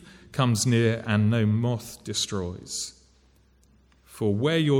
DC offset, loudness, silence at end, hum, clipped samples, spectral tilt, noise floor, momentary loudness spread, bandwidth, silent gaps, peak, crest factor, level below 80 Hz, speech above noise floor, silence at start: under 0.1%; -26 LUFS; 0 s; none; under 0.1%; -5.5 dB/octave; -60 dBFS; 10 LU; 16 kHz; none; -10 dBFS; 16 dB; -58 dBFS; 36 dB; 0.05 s